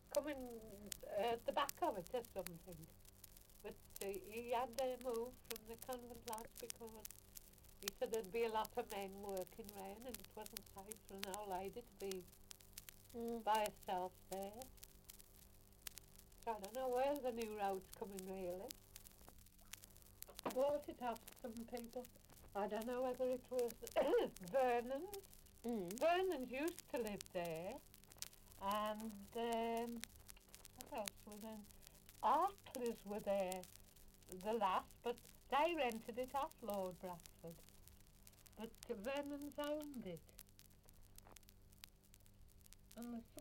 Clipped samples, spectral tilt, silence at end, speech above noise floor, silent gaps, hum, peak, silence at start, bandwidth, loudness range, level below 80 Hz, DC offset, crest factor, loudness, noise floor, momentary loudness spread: under 0.1%; -4 dB/octave; 0 s; 22 dB; none; none; -16 dBFS; 0.05 s; 17 kHz; 8 LU; -68 dBFS; under 0.1%; 30 dB; -45 LUFS; -67 dBFS; 21 LU